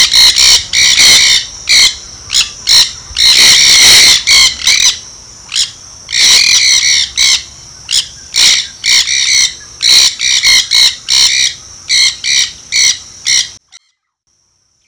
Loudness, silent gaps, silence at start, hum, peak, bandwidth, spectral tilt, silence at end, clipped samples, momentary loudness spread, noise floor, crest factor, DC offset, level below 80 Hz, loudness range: -5 LUFS; none; 0 s; none; 0 dBFS; 11 kHz; 3 dB/octave; 1.35 s; 2%; 11 LU; -61 dBFS; 10 dB; 0.3%; -40 dBFS; 4 LU